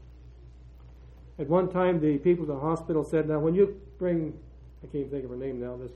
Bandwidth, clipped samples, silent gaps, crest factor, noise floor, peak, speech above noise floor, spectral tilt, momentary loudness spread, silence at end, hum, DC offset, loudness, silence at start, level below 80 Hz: 9.2 kHz; under 0.1%; none; 18 dB; -49 dBFS; -10 dBFS; 21 dB; -9.5 dB/octave; 13 LU; 0 s; none; under 0.1%; -28 LUFS; 0 s; -50 dBFS